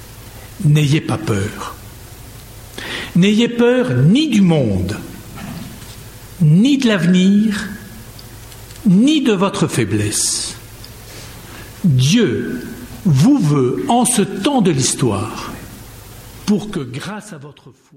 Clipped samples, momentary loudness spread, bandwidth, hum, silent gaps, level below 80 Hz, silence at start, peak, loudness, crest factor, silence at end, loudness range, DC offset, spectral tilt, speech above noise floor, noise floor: under 0.1%; 23 LU; 16.5 kHz; none; none; -42 dBFS; 0 s; -4 dBFS; -15 LUFS; 14 dB; 0.25 s; 3 LU; under 0.1%; -5.5 dB/octave; 21 dB; -36 dBFS